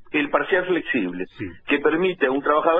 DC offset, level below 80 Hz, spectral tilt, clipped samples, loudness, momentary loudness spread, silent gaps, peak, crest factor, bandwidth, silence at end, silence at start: under 0.1%; -54 dBFS; -7.5 dB/octave; under 0.1%; -22 LUFS; 11 LU; none; -4 dBFS; 18 dB; 4 kHz; 0 s; 0 s